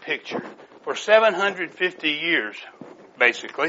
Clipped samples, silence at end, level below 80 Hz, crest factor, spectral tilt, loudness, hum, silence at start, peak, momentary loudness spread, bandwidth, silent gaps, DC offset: under 0.1%; 0 s; -74 dBFS; 22 dB; 0 dB/octave; -21 LUFS; none; 0 s; -2 dBFS; 20 LU; 8 kHz; none; under 0.1%